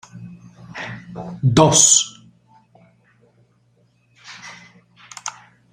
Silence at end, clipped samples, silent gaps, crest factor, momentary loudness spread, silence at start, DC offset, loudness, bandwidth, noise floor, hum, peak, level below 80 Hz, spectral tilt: 0.45 s; under 0.1%; none; 22 dB; 29 LU; 0.15 s; under 0.1%; -13 LUFS; 16 kHz; -60 dBFS; none; 0 dBFS; -56 dBFS; -3 dB/octave